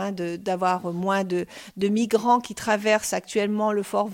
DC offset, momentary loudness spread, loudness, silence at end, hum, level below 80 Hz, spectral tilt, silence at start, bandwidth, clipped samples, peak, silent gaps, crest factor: under 0.1%; 7 LU; -24 LUFS; 0 s; none; -64 dBFS; -4.5 dB/octave; 0 s; 16.5 kHz; under 0.1%; -8 dBFS; none; 16 dB